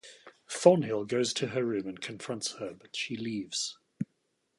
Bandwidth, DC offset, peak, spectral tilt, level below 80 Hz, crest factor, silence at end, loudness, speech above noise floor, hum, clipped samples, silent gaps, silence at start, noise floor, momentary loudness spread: 11.5 kHz; under 0.1%; -6 dBFS; -4.5 dB/octave; -74 dBFS; 26 dB; 0.55 s; -31 LUFS; 47 dB; none; under 0.1%; none; 0.05 s; -77 dBFS; 17 LU